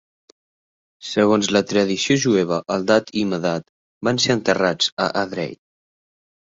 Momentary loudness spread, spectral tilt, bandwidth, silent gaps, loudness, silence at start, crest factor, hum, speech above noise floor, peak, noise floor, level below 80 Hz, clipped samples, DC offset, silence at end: 9 LU; -4 dB/octave; 7.8 kHz; 3.69-4.01 s, 4.92-4.97 s; -20 LUFS; 1 s; 18 dB; none; over 71 dB; -2 dBFS; under -90 dBFS; -58 dBFS; under 0.1%; under 0.1%; 0.95 s